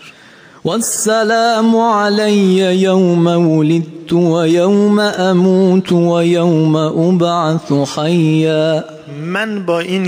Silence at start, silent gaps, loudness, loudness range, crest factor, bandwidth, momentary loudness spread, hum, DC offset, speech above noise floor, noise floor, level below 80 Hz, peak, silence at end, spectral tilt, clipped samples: 0 s; none; -13 LUFS; 2 LU; 10 dB; 16 kHz; 6 LU; none; under 0.1%; 29 dB; -41 dBFS; -60 dBFS; -2 dBFS; 0 s; -6 dB/octave; under 0.1%